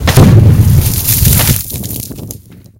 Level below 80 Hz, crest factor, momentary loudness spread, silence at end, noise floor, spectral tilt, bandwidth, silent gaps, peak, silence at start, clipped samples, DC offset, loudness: -20 dBFS; 8 dB; 20 LU; 0.4 s; -31 dBFS; -5 dB/octave; 17.5 kHz; none; 0 dBFS; 0 s; 3%; under 0.1%; -8 LUFS